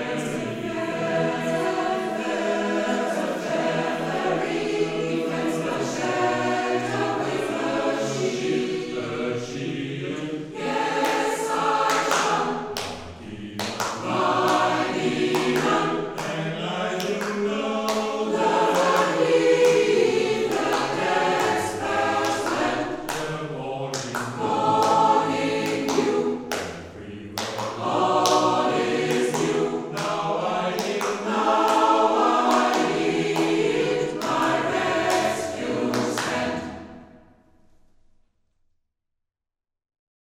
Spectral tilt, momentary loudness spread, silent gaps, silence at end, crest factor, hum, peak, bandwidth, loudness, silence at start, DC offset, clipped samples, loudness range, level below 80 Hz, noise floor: -4 dB/octave; 10 LU; none; 3.05 s; 22 dB; none; -2 dBFS; 16 kHz; -23 LUFS; 0 s; under 0.1%; under 0.1%; 5 LU; -58 dBFS; -86 dBFS